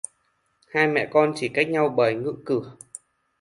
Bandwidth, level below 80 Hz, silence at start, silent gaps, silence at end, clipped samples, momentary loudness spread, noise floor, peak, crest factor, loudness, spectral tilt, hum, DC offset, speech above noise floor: 11.5 kHz; -68 dBFS; 0.75 s; none; 0.65 s; under 0.1%; 20 LU; -69 dBFS; -4 dBFS; 20 dB; -23 LUFS; -5 dB/octave; none; under 0.1%; 47 dB